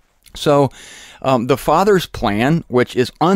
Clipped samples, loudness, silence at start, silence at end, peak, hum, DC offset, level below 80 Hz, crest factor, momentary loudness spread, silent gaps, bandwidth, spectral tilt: under 0.1%; -16 LUFS; 0.35 s; 0 s; -4 dBFS; none; under 0.1%; -40 dBFS; 12 dB; 8 LU; none; 16 kHz; -6 dB/octave